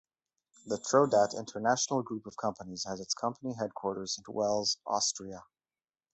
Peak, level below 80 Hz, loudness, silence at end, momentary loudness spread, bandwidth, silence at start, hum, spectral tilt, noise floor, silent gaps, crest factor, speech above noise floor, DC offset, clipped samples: -12 dBFS; -70 dBFS; -32 LUFS; 0.75 s; 12 LU; 8.4 kHz; 0.65 s; none; -3 dB/octave; under -90 dBFS; none; 22 dB; over 58 dB; under 0.1%; under 0.1%